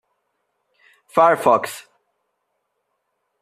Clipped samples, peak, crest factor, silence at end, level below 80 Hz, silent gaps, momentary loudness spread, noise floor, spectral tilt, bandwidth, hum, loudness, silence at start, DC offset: under 0.1%; -2 dBFS; 20 dB; 1.6 s; -68 dBFS; none; 17 LU; -74 dBFS; -4.5 dB/octave; 14.5 kHz; none; -17 LUFS; 1.15 s; under 0.1%